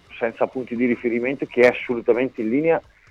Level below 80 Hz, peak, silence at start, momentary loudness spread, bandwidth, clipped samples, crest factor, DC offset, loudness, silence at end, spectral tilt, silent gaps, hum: -58 dBFS; -4 dBFS; 0.1 s; 7 LU; 7.6 kHz; under 0.1%; 18 dB; under 0.1%; -21 LUFS; 0.3 s; -7 dB/octave; none; none